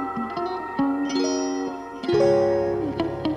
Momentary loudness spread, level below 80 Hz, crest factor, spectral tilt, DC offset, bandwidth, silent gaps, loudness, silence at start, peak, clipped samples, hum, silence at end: 9 LU; -52 dBFS; 16 dB; -5.5 dB/octave; under 0.1%; 10 kHz; none; -24 LUFS; 0 s; -8 dBFS; under 0.1%; none; 0 s